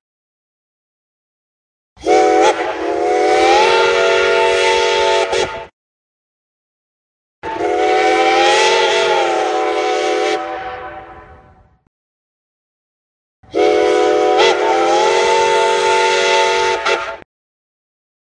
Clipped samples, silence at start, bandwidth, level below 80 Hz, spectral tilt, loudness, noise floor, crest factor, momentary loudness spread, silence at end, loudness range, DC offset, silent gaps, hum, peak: under 0.1%; 2 s; 10.5 kHz; -50 dBFS; -2 dB/octave; -13 LUFS; -47 dBFS; 16 dB; 13 LU; 1.15 s; 8 LU; under 0.1%; 5.73-7.42 s, 11.87-13.43 s; none; 0 dBFS